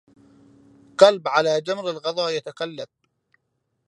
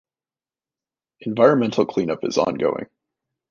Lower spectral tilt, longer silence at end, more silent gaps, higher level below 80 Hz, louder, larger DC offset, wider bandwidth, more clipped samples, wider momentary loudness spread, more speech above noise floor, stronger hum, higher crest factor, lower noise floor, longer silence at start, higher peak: second, -3.5 dB/octave vs -6 dB/octave; first, 1 s vs 0.65 s; neither; second, -74 dBFS vs -62 dBFS; about the same, -21 LUFS vs -20 LUFS; neither; first, 11 kHz vs 7.2 kHz; neither; first, 19 LU vs 15 LU; second, 54 dB vs over 70 dB; neither; about the same, 24 dB vs 20 dB; second, -75 dBFS vs under -90 dBFS; second, 1 s vs 1.2 s; about the same, 0 dBFS vs -2 dBFS